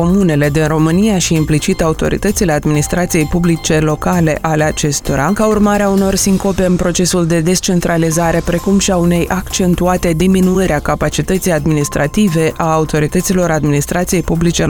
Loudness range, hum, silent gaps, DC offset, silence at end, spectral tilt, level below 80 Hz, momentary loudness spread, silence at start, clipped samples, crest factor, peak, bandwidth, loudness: 1 LU; none; none; 0.2%; 0 s; -5 dB/octave; -28 dBFS; 3 LU; 0 s; under 0.1%; 12 dB; 0 dBFS; 19.5 kHz; -13 LUFS